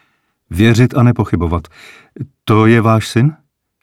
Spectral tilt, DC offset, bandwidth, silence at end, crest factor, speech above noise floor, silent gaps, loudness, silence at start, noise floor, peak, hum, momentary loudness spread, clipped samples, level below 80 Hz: -7 dB/octave; under 0.1%; 13.5 kHz; 0.5 s; 14 dB; 48 dB; none; -13 LUFS; 0.5 s; -61 dBFS; 0 dBFS; none; 16 LU; under 0.1%; -36 dBFS